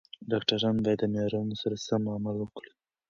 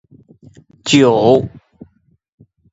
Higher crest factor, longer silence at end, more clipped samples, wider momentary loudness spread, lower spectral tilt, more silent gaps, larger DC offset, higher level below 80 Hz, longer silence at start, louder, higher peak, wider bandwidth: about the same, 20 dB vs 18 dB; second, 0.5 s vs 1.25 s; neither; second, 8 LU vs 17 LU; about the same, -6 dB/octave vs -5 dB/octave; neither; neither; second, -62 dBFS vs -50 dBFS; second, 0.2 s vs 0.85 s; second, -30 LUFS vs -12 LUFS; second, -10 dBFS vs 0 dBFS; about the same, 7.4 kHz vs 8 kHz